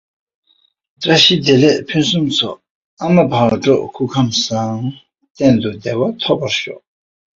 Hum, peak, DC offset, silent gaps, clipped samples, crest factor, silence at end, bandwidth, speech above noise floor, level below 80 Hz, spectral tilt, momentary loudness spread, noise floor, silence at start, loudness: none; 0 dBFS; under 0.1%; 2.70-2.97 s, 5.30-5.35 s; under 0.1%; 16 dB; 0.6 s; 7.8 kHz; 45 dB; -52 dBFS; -5 dB/octave; 12 LU; -59 dBFS; 1 s; -14 LUFS